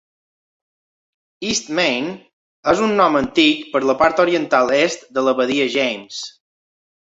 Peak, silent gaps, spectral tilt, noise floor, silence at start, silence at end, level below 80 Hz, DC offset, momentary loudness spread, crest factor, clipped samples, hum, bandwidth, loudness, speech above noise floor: -2 dBFS; 2.33-2.63 s; -3.5 dB/octave; under -90 dBFS; 1.4 s; 0.8 s; -56 dBFS; under 0.1%; 13 LU; 18 dB; under 0.1%; none; 8 kHz; -17 LUFS; over 73 dB